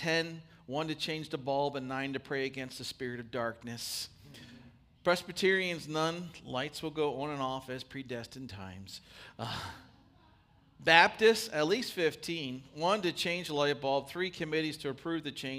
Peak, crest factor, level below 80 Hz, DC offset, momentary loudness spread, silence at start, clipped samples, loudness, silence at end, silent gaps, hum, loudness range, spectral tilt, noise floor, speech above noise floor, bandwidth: -6 dBFS; 28 dB; -68 dBFS; under 0.1%; 16 LU; 0 s; under 0.1%; -33 LUFS; 0 s; none; none; 10 LU; -4 dB/octave; -64 dBFS; 31 dB; 15.5 kHz